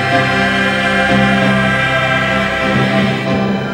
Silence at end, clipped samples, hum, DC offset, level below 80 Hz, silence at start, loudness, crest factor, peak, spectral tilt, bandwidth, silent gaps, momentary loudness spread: 0 s; under 0.1%; none; under 0.1%; -36 dBFS; 0 s; -13 LUFS; 12 dB; 0 dBFS; -5.5 dB/octave; 16 kHz; none; 3 LU